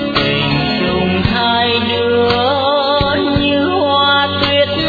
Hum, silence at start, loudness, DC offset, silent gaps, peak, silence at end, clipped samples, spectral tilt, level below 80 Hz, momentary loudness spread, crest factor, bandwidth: none; 0 s; -13 LUFS; under 0.1%; none; 0 dBFS; 0 s; under 0.1%; -7 dB/octave; -34 dBFS; 3 LU; 12 dB; 4.9 kHz